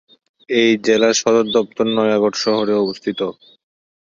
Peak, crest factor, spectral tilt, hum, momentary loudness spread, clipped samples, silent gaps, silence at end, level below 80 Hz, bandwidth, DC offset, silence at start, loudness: -2 dBFS; 16 dB; -3.5 dB/octave; none; 8 LU; under 0.1%; none; 0.75 s; -60 dBFS; 7.6 kHz; under 0.1%; 0.5 s; -17 LUFS